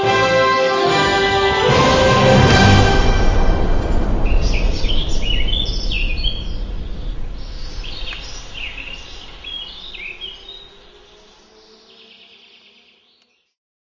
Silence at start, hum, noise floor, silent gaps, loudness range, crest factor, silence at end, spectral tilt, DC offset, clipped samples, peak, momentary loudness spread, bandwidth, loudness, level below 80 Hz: 0 s; none; -59 dBFS; none; 19 LU; 16 dB; 3.25 s; -5 dB/octave; under 0.1%; under 0.1%; 0 dBFS; 20 LU; 7.6 kHz; -16 LUFS; -22 dBFS